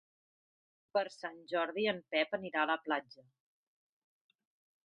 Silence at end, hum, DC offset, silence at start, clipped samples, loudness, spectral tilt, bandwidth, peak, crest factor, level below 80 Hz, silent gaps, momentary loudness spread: 1.8 s; none; under 0.1%; 0.95 s; under 0.1%; -36 LUFS; -5 dB/octave; 9 kHz; -16 dBFS; 22 dB; -86 dBFS; none; 5 LU